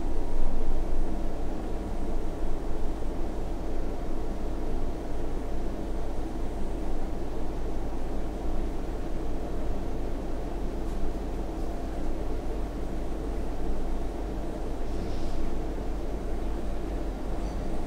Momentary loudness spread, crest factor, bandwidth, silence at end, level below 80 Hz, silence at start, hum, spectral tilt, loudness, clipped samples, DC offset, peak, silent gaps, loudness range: 2 LU; 16 dB; 6.8 kHz; 0 s; -30 dBFS; 0 s; none; -7 dB/octave; -35 LUFS; under 0.1%; under 0.1%; -10 dBFS; none; 1 LU